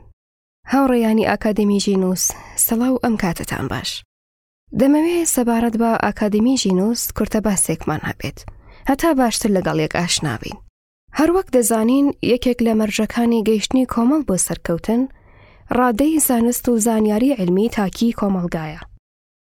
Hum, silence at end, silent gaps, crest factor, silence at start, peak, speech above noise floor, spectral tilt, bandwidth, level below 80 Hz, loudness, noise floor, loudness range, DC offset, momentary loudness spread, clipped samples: none; 0.45 s; 4.05-4.67 s, 10.69-11.08 s; 16 dB; 0.65 s; -4 dBFS; 29 dB; -4.5 dB/octave; 18 kHz; -42 dBFS; -18 LUFS; -46 dBFS; 2 LU; under 0.1%; 9 LU; under 0.1%